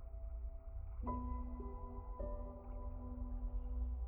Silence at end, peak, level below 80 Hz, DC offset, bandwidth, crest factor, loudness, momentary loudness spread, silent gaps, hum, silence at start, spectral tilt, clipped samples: 0 s; -30 dBFS; -44 dBFS; under 0.1%; 2.4 kHz; 14 dB; -48 LUFS; 6 LU; none; none; 0 s; -12 dB/octave; under 0.1%